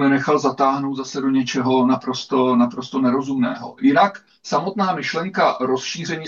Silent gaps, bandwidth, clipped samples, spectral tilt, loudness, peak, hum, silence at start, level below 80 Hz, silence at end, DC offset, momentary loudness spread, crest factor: none; 7.4 kHz; under 0.1%; -5.5 dB/octave; -19 LUFS; -4 dBFS; none; 0 s; -68 dBFS; 0 s; under 0.1%; 7 LU; 16 dB